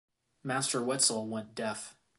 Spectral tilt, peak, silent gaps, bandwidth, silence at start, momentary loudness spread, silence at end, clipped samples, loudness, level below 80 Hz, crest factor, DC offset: -2.5 dB/octave; -12 dBFS; none; 12 kHz; 0.45 s; 13 LU; 0.25 s; under 0.1%; -31 LUFS; -78 dBFS; 22 dB; under 0.1%